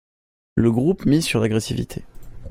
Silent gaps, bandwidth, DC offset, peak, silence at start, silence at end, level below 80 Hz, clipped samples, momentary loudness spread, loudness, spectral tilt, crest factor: none; 16 kHz; under 0.1%; -4 dBFS; 0.55 s; 0 s; -42 dBFS; under 0.1%; 11 LU; -20 LUFS; -6 dB/octave; 18 dB